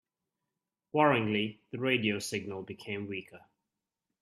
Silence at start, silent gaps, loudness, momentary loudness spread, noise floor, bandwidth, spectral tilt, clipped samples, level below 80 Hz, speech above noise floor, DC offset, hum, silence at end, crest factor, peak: 0.95 s; none; -32 LUFS; 15 LU; -88 dBFS; 14 kHz; -5 dB/octave; under 0.1%; -74 dBFS; 57 dB; under 0.1%; none; 0.85 s; 24 dB; -10 dBFS